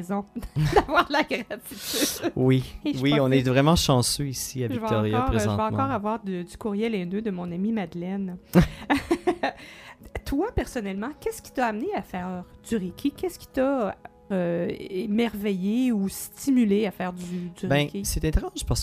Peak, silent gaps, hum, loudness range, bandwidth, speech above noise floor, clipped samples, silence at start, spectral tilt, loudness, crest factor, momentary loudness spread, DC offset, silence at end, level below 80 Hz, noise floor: -4 dBFS; none; none; 6 LU; 15.5 kHz; 20 dB; under 0.1%; 0 s; -5.5 dB/octave; -26 LUFS; 20 dB; 11 LU; under 0.1%; 0 s; -40 dBFS; -46 dBFS